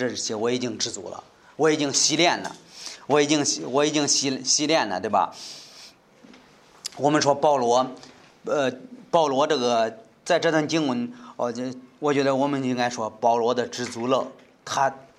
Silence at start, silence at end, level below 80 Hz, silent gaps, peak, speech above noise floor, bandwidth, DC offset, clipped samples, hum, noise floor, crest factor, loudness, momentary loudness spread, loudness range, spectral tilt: 0 s; 0.15 s; -72 dBFS; none; -4 dBFS; 29 dB; 13.5 kHz; under 0.1%; under 0.1%; none; -52 dBFS; 20 dB; -23 LUFS; 17 LU; 3 LU; -3 dB/octave